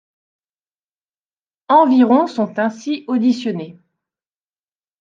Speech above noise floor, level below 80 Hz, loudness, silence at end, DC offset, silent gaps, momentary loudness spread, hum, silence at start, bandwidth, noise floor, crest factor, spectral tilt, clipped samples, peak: over 75 dB; -72 dBFS; -16 LUFS; 1.3 s; under 0.1%; none; 13 LU; none; 1.7 s; 7.4 kHz; under -90 dBFS; 18 dB; -6.5 dB/octave; under 0.1%; -2 dBFS